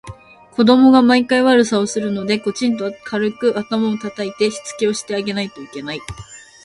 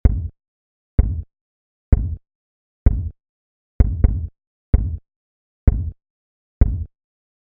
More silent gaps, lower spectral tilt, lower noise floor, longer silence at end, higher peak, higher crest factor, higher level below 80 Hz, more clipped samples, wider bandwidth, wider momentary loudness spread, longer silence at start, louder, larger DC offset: second, none vs 0.48-0.98 s, 1.41-1.92 s, 2.35-2.86 s, 3.29-3.79 s, 4.47-4.73 s, 5.16-5.67 s, 6.10-6.61 s; second, -4.5 dB/octave vs -11 dB/octave; second, -38 dBFS vs under -90 dBFS; second, 0.25 s vs 0.6 s; about the same, 0 dBFS vs 0 dBFS; about the same, 16 dB vs 20 dB; second, -52 dBFS vs -22 dBFS; neither; first, 11.5 kHz vs 2.4 kHz; first, 16 LU vs 13 LU; about the same, 0.05 s vs 0.05 s; first, -17 LUFS vs -22 LUFS; neither